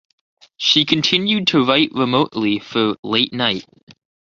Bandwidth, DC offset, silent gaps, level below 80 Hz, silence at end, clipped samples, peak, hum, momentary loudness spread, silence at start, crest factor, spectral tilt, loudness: 7.6 kHz; under 0.1%; 2.99-3.03 s, 3.83-3.87 s; -58 dBFS; 0.3 s; under 0.1%; -2 dBFS; none; 6 LU; 0.6 s; 18 dB; -4.5 dB/octave; -17 LUFS